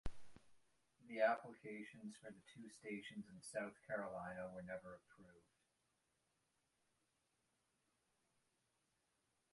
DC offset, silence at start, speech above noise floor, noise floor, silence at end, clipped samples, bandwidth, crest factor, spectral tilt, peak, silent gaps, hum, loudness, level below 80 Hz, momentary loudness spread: under 0.1%; 0.05 s; 38 dB; -86 dBFS; 4.15 s; under 0.1%; 11.5 kHz; 26 dB; -5 dB/octave; -26 dBFS; none; none; -48 LUFS; -68 dBFS; 20 LU